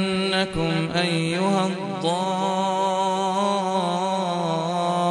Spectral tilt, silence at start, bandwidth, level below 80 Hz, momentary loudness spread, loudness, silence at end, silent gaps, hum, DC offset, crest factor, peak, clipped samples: -5 dB/octave; 0 s; 11.5 kHz; -54 dBFS; 2 LU; -23 LUFS; 0 s; none; none; under 0.1%; 16 dB; -8 dBFS; under 0.1%